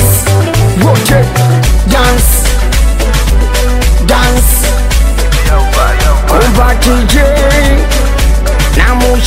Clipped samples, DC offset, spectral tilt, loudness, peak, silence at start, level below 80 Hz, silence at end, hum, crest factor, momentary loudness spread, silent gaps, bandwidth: 0.2%; under 0.1%; -4.5 dB/octave; -9 LUFS; 0 dBFS; 0 s; -10 dBFS; 0 s; none; 6 dB; 3 LU; none; 16.5 kHz